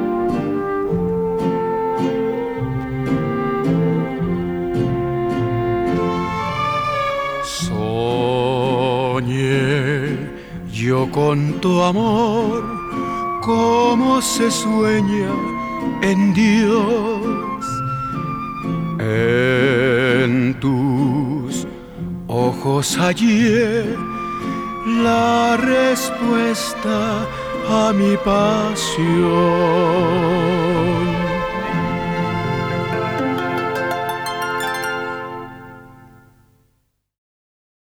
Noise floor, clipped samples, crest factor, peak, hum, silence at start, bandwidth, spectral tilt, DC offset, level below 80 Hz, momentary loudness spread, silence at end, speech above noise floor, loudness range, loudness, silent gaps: -66 dBFS; under 0.1%; 16 dB; -2 dBFS; none; 0 s; 19 kHz; -5.5 dB/octave; under 0.1%; -42 dBFS; 9 LU; 2.05 s; 50 dB; 4 LU; -18 LUFS; none